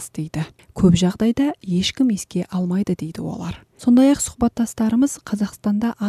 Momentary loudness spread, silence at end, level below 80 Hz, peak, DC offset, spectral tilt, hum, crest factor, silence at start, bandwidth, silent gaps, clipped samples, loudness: 12 LU; 0 s; -44 dBFS; -4 dBFS; under 0.1%; -6 dB/octave; none; 16 dB; 0 s; 14 kHz; none; under 0.1%; -20 LUFS